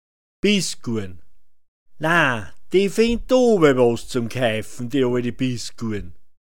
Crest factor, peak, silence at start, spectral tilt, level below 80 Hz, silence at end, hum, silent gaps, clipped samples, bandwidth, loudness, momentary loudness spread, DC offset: 18 dB; -2 dBFS; 0.4 s; -5 dB/octave; -44 dBFS; 0 s; none; 1.68-1.86 s; under 0.1%; 17 kHz; -20 LUFS; 13 LU; 2%